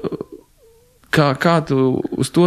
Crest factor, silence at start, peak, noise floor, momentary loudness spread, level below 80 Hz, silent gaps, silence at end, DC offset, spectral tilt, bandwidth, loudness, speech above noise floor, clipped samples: 16 dB; 0 s; -2 dBFS; -52 dBFS; 14 LU; -50 dBFS; none; 0 s; under 0.1%; -6.5 dB/octave; 14 kHz; -17 LUFS; 36 dB; under 0.1%